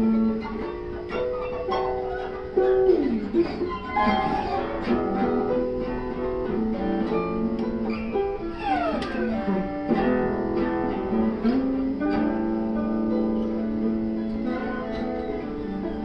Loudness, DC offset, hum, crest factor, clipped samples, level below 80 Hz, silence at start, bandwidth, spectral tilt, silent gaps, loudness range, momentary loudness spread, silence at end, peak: -26 LUFS; under 0.1%; none; 16 dB; under 0.1%; -42 dBFS; 0 s; 6 kHz; -8.5 dB/octave; none; 3 LU; 7 LU; 0 s; -10 dBFS